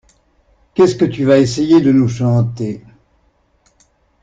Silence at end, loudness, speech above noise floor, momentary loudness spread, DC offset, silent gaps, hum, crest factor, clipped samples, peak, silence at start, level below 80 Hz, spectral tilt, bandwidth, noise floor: 1.45 s; -14 LUFS; 45 dB; 14 LU; under 0.1%; none; none; 14 dB; under 0.1%; -2 dBFS; 0.75 s; -50 dBFS; -7.5 dB/octave; 9 kHz; -58 dBFS